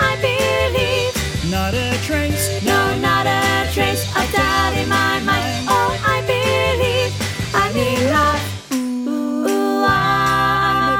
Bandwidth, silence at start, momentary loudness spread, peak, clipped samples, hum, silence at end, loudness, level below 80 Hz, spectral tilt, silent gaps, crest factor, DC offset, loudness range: 18 kHz; 0 s; 5 LU; -2 dBFS; under 0.1%; none; 0 s; -17 LUFS; -34 dBFS; -4.5 dB/octave; none; 16 dB; under 0.1%; 1 LU